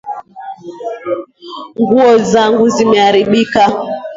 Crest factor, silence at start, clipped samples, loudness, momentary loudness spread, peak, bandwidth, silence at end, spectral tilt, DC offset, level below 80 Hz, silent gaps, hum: 12 dB; 0.05 s; under 0.1%; -11 LUFS; 20 LU; 0 dBFS; 7.8 kHz; 0 s; -5 dB/octave; under 0.1%; -52 dBFS; none; none